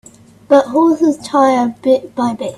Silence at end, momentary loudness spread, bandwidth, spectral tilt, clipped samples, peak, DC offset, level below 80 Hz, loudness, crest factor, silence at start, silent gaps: 0 s; 4 LU; 12.5 kHz; -5.5 dB/octave; under 0.1%; 0 dBFS; under 0.1%; -58 dBFS; -13 LUFS; 14 dB; 0.5 s; none